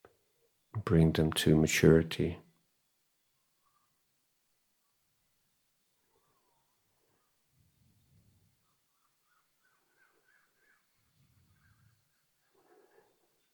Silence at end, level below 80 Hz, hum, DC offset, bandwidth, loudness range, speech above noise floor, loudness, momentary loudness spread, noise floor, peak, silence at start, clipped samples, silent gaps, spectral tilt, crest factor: 11.15 s; -54 dBFS; none; under 0.1%; 17.5 kHz; 12 LU; 51 dB; -28 LUFS; 17 LU; -78 dBFS; -8 dBFS; 0.75 s; under 0.1%; none; -6 dB/octave; 28 dB